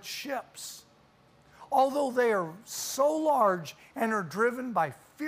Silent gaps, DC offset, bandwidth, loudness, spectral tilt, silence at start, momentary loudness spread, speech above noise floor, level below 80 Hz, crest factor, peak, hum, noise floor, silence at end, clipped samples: none; under 0.1%; 15.5 kHz; -29 LUFS; -4 dB/octave; 0.05 s; 15 LU; 32 dB; -74 dBFS; 18 dB; -12 dBFS; none; -61 dBFS; 0 s; under 0.1%